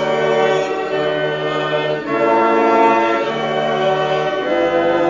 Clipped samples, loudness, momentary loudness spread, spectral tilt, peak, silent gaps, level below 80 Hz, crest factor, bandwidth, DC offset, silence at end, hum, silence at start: under 0.1%; -16 LUFS; 6 LU; -5.5 dB/octave; -2 dBFS; none; -52 dBFS; 14 dB; 7.6 kHz; under 0.1%; 0 s; none; 0 s